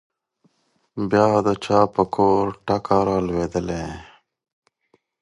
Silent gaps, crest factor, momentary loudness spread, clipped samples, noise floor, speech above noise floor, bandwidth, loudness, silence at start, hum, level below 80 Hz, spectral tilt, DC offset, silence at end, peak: none; 20 dB; 12 LU; under 0.1%; -66 dBFS; 46 dB; 11 kHz; -20 LUFS; 0.95 s; none; -46 dBFS; -7 dB/octave; under 0.1%; 1.2 s; -2 dBFS